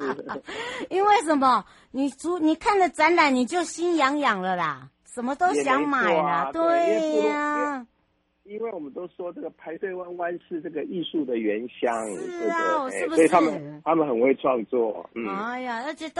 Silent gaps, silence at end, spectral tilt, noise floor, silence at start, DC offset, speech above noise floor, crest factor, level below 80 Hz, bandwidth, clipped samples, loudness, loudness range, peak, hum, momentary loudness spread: none; 0 s; -4.5 dB/octave; -69 dBFS; 0 s; under 0.1%; 45 dB; 18 dB; -64 dBFS; 11.5 kHz; under 0.1%; -24 LUFS; 9 LU; -6 dBFS; none; 14 LU